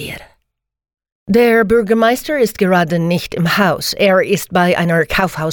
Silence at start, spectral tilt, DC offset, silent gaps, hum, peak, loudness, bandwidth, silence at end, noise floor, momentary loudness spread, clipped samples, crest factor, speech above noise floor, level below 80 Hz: 0 s; -5.5 dB/octave; under 0.1%; 1.12-1.26 s; none; -2 dBFS; -14 LUFS; 19 kHz; 0 s; -70 dBFS; 5 LU; under 0.1%; 14 dB; 56 dB; -42 dBFS